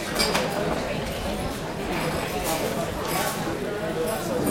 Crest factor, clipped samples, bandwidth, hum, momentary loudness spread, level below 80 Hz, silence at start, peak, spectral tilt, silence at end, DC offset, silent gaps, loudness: 18 dB; under 0.1%; 16.5 kHz; none; 6 LU; -42 dBFS; 0 s; -10 dBFS; -4 dB/octave; 0 s; under 0.1%; none; -27 LUFS